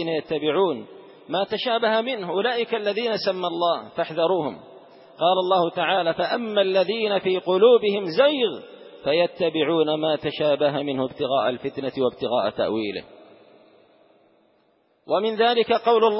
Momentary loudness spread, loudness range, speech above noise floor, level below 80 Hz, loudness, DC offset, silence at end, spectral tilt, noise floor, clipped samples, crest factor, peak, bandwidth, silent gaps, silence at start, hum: 8 LU; 6 LU; 42 dB; -66 dBFS; -22 LUFS; under 0.1%; 0 s; -9 dB/octave; -64 dBFS; under 0.1%; 16 dB; -6 dBFS; 5.8 kHz; none; 0 s; none